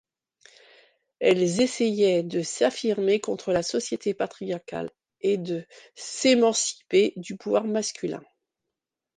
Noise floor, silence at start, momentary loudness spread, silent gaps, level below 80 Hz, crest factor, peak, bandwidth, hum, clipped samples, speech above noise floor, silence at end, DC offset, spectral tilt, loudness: -86 dBFS; 1.2 s; 12 LU; none; -68 dBFS; 18 dB; -8 dBFS; 10 kHz; none; under 0.1%; 61 dB; 1 s; under 0.1%; -4 dB/octave; -25 LUFS